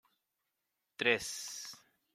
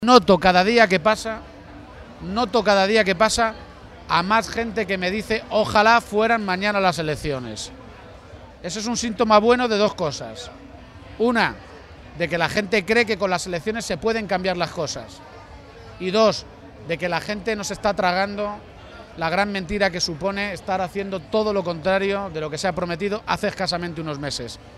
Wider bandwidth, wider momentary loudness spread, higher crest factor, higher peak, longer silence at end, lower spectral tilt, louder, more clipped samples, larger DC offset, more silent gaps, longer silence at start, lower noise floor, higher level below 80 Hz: first, 16 kHz vs 14.5 kHz; first, 23 LU vs 20 LU; about the same, 26 dB vs 22 dB; second, -14 dBFS vs 0 dBFS; first, 0.35 s vs 0 s; second, -1.5 dB/octave vs -4 dB/octave; second, -35 LUFS vs -21 LUFS; neither; neither; neither; first, 1 s vs 0 s; first, -86 dBFS vs -42 dBFS; second, -76 dBFS vs -46 dBFS